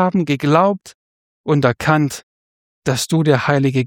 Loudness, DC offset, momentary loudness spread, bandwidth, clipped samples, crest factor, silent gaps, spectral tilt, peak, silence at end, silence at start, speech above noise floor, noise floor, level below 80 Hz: -16 LUFS; under 0.1%; 11 LU; 17 kHz; under 0.1%; 16 dB; 0.95-1.44 s, 2.23-2.82 s; -6 dB/octave; -2 dBFS; 0 s; 0 s; over 74 dB; under -90 dBFS; -52 dBFS